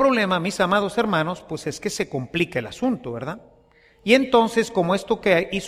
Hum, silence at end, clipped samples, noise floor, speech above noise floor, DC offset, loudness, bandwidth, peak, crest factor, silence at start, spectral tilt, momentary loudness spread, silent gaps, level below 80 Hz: none; 0 s; under 0.1%; -55 dBFS; 34 dB; under 0.1%; -22 LUFS; 15 kHz; -2 dBFS; 20 dB; 0 s; -5 dB/octave; 12 LU; none; -54 dBFS